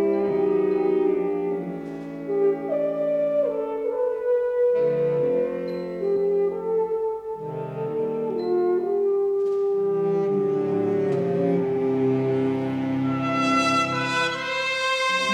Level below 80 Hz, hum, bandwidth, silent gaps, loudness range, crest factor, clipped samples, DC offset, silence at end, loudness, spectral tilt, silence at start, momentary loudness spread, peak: -62 dBFS; none; 11 kHz; none; 2 LU; 12 dB; under 0.1%; under 0.1%; 0 s; -24 LUFS; -5.5 dB/octave; 0 s; 7 LU; -10 dBFS